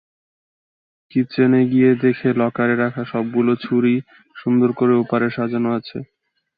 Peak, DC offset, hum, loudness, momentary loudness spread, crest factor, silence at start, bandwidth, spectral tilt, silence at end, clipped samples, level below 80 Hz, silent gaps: -4 dBFS; under 0.1%; none; -18 LUFS; 9 LU; 16 dB; 1.15 s; 5 kHz; -11 dB/octave; 0.55 s; under 0.1%; -62 dBFS; none